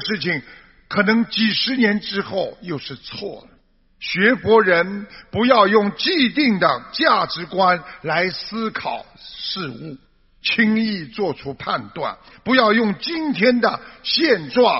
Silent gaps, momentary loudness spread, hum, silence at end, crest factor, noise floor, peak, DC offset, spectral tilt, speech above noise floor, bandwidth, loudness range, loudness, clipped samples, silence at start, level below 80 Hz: none; 14 LU; none; 0 s; 20 dB; -54 dBFS; 0 dBFS; under 0.1%; -2.5 dB/octave; 35 dB; 6 kHz; 6 LU; -19 LUFS; under 0.1%; 0 s; -56 dBFS